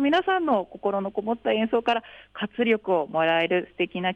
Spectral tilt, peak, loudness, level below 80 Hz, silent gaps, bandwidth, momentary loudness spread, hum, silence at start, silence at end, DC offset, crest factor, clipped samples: -6.5 dB/octave; -10 dBFS; -25 LUFS; -64 dBFS; none; 8.4 kHz; 7 LU; none; 0 s; 0 s; under 0.1%; 14 dB; under 0.1%